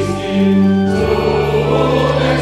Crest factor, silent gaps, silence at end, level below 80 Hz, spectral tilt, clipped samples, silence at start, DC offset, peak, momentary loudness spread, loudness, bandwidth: 12 dB; none; 0 s; -30 dBFS; -7 dB/octave; under 0.1%; 0 s; under 0.1%; 0 dBFS; 3 LU; -14 LUFS; 12.5 kHz